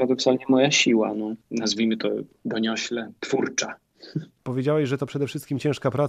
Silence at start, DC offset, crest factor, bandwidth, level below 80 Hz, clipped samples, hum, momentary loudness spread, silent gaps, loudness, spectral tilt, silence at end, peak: 0 s; under 0.1%; 18 dB; 13 kHz; -68 dBFS; under 0.1%; none; 13 LU; none; -24 LUFS; -4.5 dB/octave; 0 s; -6 dBFS